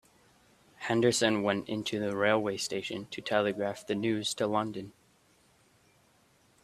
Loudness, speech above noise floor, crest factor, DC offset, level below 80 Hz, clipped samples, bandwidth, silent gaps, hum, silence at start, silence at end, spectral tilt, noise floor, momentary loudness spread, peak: -30 LUFS; 36 dB; 22 dB; under 0.1%; -70 dBFS; under 0.1%; 14 kHz; none; none; 0.8 s; 1.75 s; -4 dB/octave; -66 dBFS; 11 LU; -10 dBFS